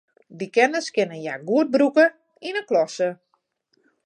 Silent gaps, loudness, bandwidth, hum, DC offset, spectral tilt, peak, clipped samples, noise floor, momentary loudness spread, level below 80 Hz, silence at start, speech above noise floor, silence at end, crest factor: none; -22 LUFS; 11 kHz; none; under 0.1%; -4.5 dB/octave; -4 dBFS; under 0.1%; -70 dBFS; 12 LU; -80 dBFS; 0.3 s; 49 dB; 0.9 s; 20 dB